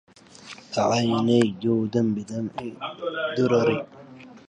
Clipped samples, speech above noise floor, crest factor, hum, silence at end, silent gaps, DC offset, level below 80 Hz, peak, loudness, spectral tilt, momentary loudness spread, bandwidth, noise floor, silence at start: under 0.1%; 22 dB; 18 dB; none; 0.1 s; none; under 0.1%; -62 dBFS; -8 dBFS; -24 LUFS; -6 dB/octave; 13 LU; 9.8 kHz; -45 dBFS; 0.4 s